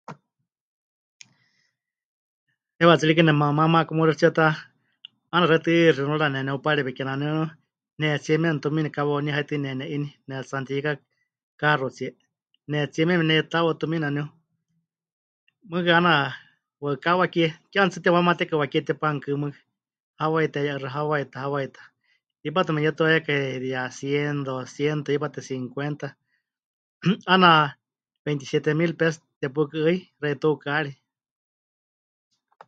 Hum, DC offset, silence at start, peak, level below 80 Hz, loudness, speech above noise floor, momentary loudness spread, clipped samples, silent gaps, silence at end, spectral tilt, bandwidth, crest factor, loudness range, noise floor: none; under 0.1%; 0.1 s; -2 dBFS; -70 dBFS; -23 LUFS; 57 dB; 13 LU; under 0.1%; 0.61-1.20 s, 2.05-2.47 s, 11.43-11.58 s, 15.12-15.47 s, 20.00-20.14 s, 26.64-27.00 s, 28.19-28.25 s, 29.36-29.41 s; 1.75 s; -6.5 dB/octave; 7.8 kHz; 24 dB; 7 LU; -80 dBFS